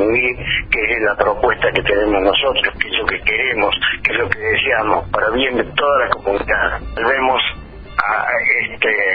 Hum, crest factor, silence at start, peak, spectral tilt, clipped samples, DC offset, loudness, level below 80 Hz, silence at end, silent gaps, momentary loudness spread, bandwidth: none; 16 dB; 0 s; 0 dBFS; -6.5 dB/octave; under 0.1%; under 0.1%; -16 LUFS; -36 dBFS; 0 s; none; 4 LU; 5.6 kHz